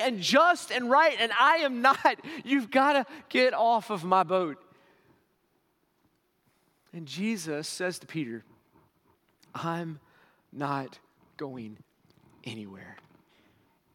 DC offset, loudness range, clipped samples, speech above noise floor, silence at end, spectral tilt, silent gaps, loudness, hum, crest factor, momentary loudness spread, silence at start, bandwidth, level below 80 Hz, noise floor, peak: under 0.1%; 16 LU; under 0.1%; 45 dB; 1 s; -4 dB/octave; none; -26 LUFS; none; 22 dB; 22 LU; 0 s; 17 kHz; -82 dBFS; -72 dBFS; -6 dBFS